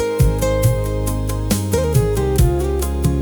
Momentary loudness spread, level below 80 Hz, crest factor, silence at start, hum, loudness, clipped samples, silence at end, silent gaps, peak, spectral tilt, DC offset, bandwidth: 5 LU; -22 dBFS; 12 dB; 0 s; none; -18 LUFS; under 0.1%; 0 s; none; -4 dBFS; -6.5 dB/octave; under 0.1%; over 20 kHz